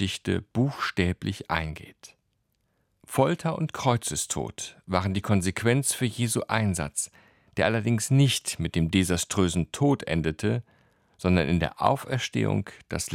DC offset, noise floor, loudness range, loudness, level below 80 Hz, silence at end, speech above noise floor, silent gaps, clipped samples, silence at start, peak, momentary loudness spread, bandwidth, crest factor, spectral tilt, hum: under 0.1%; -74 dBFS; 4 LU; -26 LUFS; -52 dBFS; 0 s; 48 dB; none; under 0.1%; 0 s; -6 dBFS; 8 LU; 17 kHz; 22 dB; -5 dB/octave; none